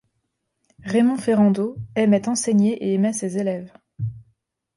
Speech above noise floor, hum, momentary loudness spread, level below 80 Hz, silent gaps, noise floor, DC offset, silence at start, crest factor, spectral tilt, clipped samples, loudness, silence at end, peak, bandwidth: 55 dB; none; 13 LU; -60 dBFS; none; -75 dBFS; under 0.1%; 0.85 s; 14 dB; -6 dB/octave; under 0.1%; -21 LUFS; 0.55 s; -6 dBFS; 11.5 kHz